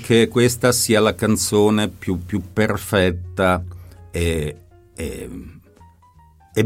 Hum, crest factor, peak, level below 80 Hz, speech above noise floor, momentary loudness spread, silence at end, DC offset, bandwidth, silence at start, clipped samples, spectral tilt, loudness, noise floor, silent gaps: none; 18 dB; -2 dBFS; -44 dBFS; 32 dB; 15 LU; 0 s; under 0.1%; 16.5 kHz; 0 s; under 0.1%; -4.5 dB/octave; -19 LUFS; -50 dBFS; none